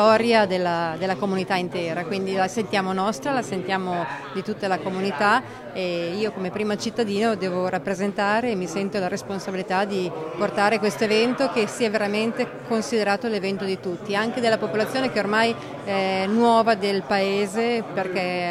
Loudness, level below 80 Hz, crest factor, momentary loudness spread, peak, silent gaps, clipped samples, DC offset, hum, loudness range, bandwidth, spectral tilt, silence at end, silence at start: -23 LUFS; -62 dBFS; 18 dB; 7 LU; -4 dBFS; none; under 0.1%; under 0.1%; none; 3 LU; 14.5 kHz; -5 dB/octave; 0 s; 0 s